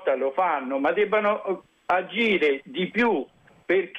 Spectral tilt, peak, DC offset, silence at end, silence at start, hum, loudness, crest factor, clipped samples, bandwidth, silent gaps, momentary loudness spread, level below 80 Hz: -6.5 dB/octave; -12 dBFS; under 0.1%; 0 s; 0 s; none; -24 LUFS; 14 dB; under 0.1%; 8.2 kHz; none; 7 LU; -66 dBFS